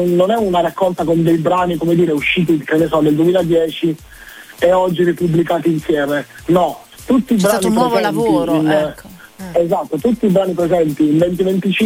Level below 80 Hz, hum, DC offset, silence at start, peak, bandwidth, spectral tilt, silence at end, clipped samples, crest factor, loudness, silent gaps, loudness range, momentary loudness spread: -44 dBFS; none; under 0.1%; 0 s; 0 dBFS; 16.5 kHz; -6.5 dB/octave; 0 s; under 0.1%; 14 dB; -15 LUFS; none; 2 LU; 6 LU